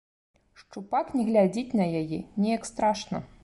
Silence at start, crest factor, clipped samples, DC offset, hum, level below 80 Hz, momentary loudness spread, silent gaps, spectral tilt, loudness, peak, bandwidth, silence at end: 0.7 s; 16 dB; under 0.1%; under 0.1%; none; -60 dBFS; 11 LU; none; -6.5 dB/octave; -27 LUFS; -12 dBFS; 11.5 kHz; 0.15 s